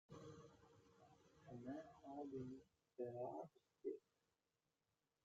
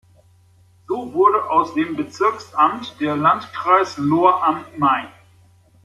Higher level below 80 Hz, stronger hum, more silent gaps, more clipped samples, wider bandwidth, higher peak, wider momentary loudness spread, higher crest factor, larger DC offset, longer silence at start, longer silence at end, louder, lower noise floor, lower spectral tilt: second, -86 dBFS vs -62 dBFS; neither; neither; neither; second, 7.6 kHz vs 12.5 kHz; second, -38 dBFS vs -2 dBFS; first, 13 LU vs 9 LU; about the same, 18 dB vs 18 dB; neither; second, 0.1 s vs 0.9 s; first, 1.25 s vs 0.75 s; second, -55 LUFS vs -18 LUFS; first, under -90 dBFS vs -53 dBFS; first, -7.5 dB/octave vs -6 dB/octave